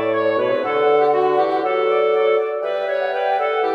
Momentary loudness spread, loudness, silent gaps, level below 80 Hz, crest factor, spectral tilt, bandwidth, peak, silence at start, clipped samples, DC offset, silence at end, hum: 5 LU; -18 LUFS; none; -70 dBFS; 12 dB; -6 dB/octave; 5.8 kHz; -4 dBFS; 0 s; under 0.1%; under 0.1%; 0 s; none